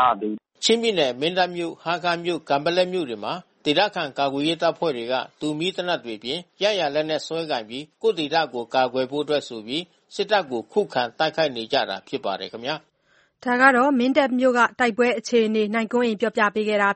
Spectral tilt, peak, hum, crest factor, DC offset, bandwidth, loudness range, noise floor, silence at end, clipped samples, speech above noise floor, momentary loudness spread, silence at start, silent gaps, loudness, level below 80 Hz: -4 dB/octave; 0 dBFS; none; 22 dB; under 0.1%; 8.8 kHz; 5 LU; -62 dBFS; 0 s; under 0.1%; 40 dB; 10 LU; 0 s; none; -23 LUFS; -68 dBFS